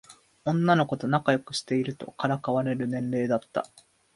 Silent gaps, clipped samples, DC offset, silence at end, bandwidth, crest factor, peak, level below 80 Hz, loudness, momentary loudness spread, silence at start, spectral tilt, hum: none; under 0.1%; under 0.1%; 0.55 s; 11.5 kHz; 20 dB; -8 dBFS; -68 dBFS; -27 LUFS; 11 LU; 0.1 s; -6.5 dB/octave; none